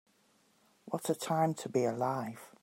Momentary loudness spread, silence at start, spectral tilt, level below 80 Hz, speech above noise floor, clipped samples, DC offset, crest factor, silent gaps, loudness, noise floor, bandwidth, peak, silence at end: 8 LU; 0.85 s; -5.5 dB/octave; -82 dBFS; 36 dB; under 0.1%; under 0.1%; 18 dB; none; -34 LUFS; -70 dBFS; 16 kHz; -18 dBFS; 0.15 s